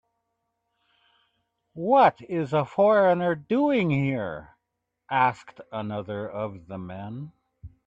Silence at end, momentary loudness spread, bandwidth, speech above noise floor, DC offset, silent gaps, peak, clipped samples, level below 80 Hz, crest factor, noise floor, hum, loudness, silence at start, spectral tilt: 0.2 s; 19 LU; 8 kHz; 57 dB; under 0.1%; none; -6 dBFS; under 0.1%; -62 dBFS; 20 dB; -81 dBFS; none; -24 LUFS; 1.75 s; -8.5 dB/octave